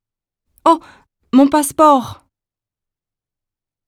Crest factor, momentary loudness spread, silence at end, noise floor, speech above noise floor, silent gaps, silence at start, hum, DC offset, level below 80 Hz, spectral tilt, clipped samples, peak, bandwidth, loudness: 18 dB; 7 LU; 1.75 s; -88 dBFS; 75 dB; none; 0.65 s; none; under 0.1%; -56 dBFS; -4 dB/octave; under 0.1%; 0 dBFS; 15.5 kHz; -14 LUFS